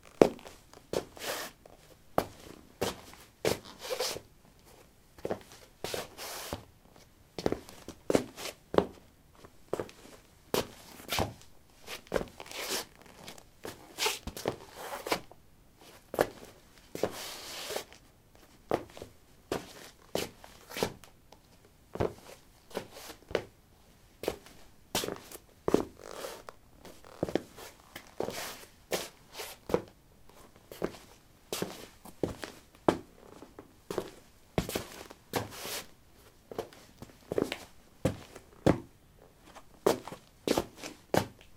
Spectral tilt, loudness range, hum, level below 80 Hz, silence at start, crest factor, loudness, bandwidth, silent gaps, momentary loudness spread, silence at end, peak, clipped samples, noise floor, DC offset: -4 dB/octave; 5 LU; none; -58 dBFS; 0.05 s; 36 dB; -36 LUFS; 17.5 kHz; none; 22 LU; 0 s; 0 dBFS; under 0.1%; -60 dBFS; under 0.1%